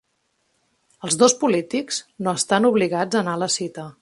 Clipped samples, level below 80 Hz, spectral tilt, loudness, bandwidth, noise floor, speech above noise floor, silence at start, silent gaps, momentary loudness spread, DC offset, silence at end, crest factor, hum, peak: under 0.1%; -66 dBFS; -3.5 dB/octave; -20 LUFS; 11.5 kHz; -70 dBFS; 49 dB; 1.05 s; none; 9 LU; under 0.1%; 0.1 s; 22 dB; none; 0 dBFS